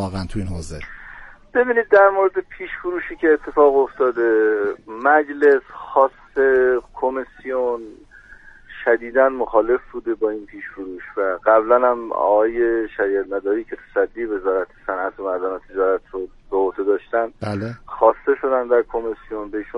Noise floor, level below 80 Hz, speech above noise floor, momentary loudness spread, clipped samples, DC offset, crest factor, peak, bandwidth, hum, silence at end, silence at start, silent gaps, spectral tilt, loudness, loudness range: -44 dBFS; -46 dBFS; 25 dB; 14 LU; under 0.1%; under 0.1%; 18 dB; -2 dBFS; 11 kHz; none; 0 s; 0 s; none; -7 dB/octave; -19 LUFS; 5 LU